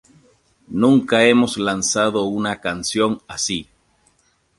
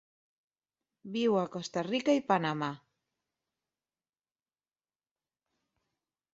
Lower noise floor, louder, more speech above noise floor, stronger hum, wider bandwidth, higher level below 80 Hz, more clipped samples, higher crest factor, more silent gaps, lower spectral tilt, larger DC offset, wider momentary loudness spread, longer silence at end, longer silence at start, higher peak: second, -62 dBFS vs under -90 dBFS; first, -18 LUFS vs -31 LUFS; second, 44 dB vs over 59 dB; neither; first, 11.5 kHz vs 7.8 kHz; first, -54 dBFS vs -80 dBFS; neither; second, 18 dB vs 24 dB; neither; second, -3.5 dB/octave vs -5.5 dB/octave; neither; about the same, 9 LU vs 10 LU; second, 0.95 s vs 3.55 s; second, 0.7 s vs 1.05 s; first, -2 dBFS vs -12 dBFS